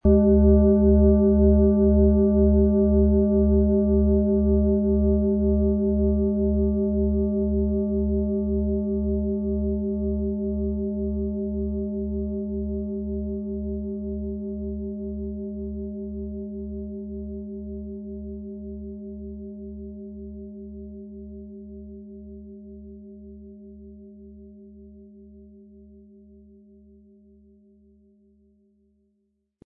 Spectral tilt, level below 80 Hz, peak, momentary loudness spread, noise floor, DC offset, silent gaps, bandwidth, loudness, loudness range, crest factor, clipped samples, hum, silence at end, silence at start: -16.5 dB/octave; -32 dBFS; -6 dBFS; 23 LU; -73 dBFS; under 0.1%; none; 1.6 kHz; -23 LUFS; 22 LU; 18 dB; under 0.1%; none; 4.2 s; 0.05 s